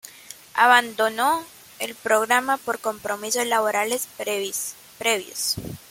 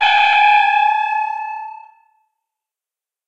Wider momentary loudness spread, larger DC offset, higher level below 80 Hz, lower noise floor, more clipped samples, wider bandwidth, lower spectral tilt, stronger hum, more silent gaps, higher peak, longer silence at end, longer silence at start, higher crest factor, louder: second, 13 LU vs 17 LU; neither; first, -60 dBFS vs -68 dBFS; second, -45 dBFS vs -89 dBFS; neither; first, 17 kHz vs 8 kHz; first, -1.5 dB/octave vs 3 dB/octave; neither; neither; about the same, -2 dBFS vs -2 dBFS; second, 0.15 s vs 1.5 s; about the same, 0.05 s vs 0 s; first, 22 dB vs 16 dB; second, -22 LUFS vs -14 LUFS